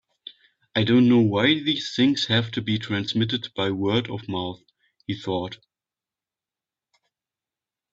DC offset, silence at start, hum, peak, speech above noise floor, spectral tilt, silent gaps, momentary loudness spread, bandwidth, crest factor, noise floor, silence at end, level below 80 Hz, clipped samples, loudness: under 0.1%; 0.75 s; none; -6 dBFS; over 68 dB; -6 dB/octave; none; 17 LU; 7.8 kHz; 20 dB; under -90 dBFS; 2.4 s; -60 dBFS; under 0.1%; -23 LUFS